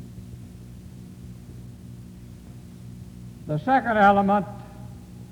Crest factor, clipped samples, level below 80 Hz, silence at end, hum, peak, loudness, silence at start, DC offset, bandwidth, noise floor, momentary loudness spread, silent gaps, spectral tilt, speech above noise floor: 22 dB; under 0.1%; -50 dBFS; 0 s; 60 Hz at -50 dBFS; -6 dBFS; -21 LUFS; 0 s; under 0.1%; 18.5 kHz; -42 dBFS; 25 LU; none; -7.5 dB/octave; 22 dB